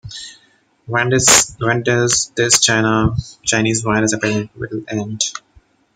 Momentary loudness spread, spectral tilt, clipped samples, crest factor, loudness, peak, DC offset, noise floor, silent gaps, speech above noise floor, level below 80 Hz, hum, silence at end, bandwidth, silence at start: 15 LU; -3 dB/octave; under 0.1%; 18 dB; -15 LUFS; 0 dBFS; under 0.1%; -56 dBFS; none; 40 dB; -42 dBFS; none; 0.55 s; 16.5 kHz; 0.05 s